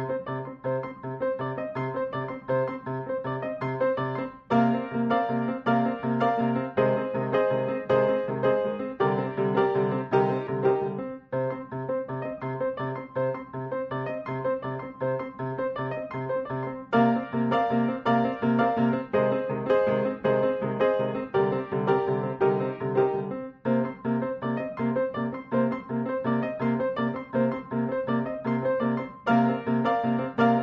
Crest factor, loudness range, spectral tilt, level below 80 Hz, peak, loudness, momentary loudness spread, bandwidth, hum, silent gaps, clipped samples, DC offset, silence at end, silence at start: 18 dB; 6 LU; -6.5 dB/octave; -62 dBFS; -8 dBFS; -27 LUFS; 8 LU; 5.8 kHz; none; none; under 0.1%; under 0.1%; 0 s; 0 s